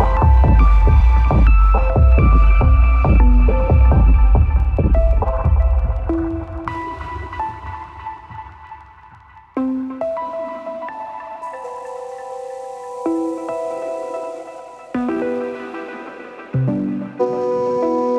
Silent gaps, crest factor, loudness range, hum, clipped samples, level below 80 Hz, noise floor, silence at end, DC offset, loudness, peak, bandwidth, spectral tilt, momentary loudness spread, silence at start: none; 14 dB; 13 LU; none; under 0.1%; -16 dBFS; -44 dBFS; 0 s; under 0.1%; -17 LUFS; -2 dBFS; 3.7 kHz; -9.5 dB/octave; 18 LU; 0 s